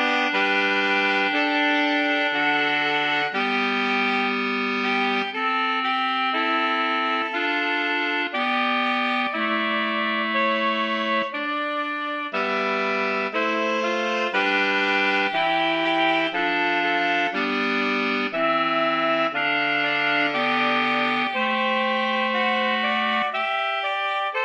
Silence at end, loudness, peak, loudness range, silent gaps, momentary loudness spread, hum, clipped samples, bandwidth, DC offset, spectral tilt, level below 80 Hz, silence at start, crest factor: 0 s; -22 LUFS; -8 dBFS; 3 LU; none; 3 LU; none; under 0.1%; 9.4 kHz; under 0.1%; -4 dB/octave; -74 dBFS; 0 s; 14 dB